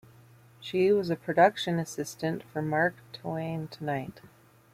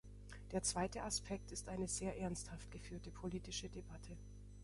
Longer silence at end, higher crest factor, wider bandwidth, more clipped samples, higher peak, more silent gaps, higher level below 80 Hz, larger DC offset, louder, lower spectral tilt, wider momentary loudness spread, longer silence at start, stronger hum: first, 0.45 s vs 0 s; about the same, 22 dB vs 18 dB; first, 16 kHz vs 11.5 kHz; neither; first, -8 dBFS vs -28 dBFS; neither; second, -68 dBFS vs -56 dBFS; neither; first, -29 LUFS vs -45 LUFS; first, -5.5 dB/octave vs -3.5 dB/octave; about the same, 13 LU vs 15 LU; first, 0.6 s vs 0.05 s; second, none vs 50 Hz at -55 dBFS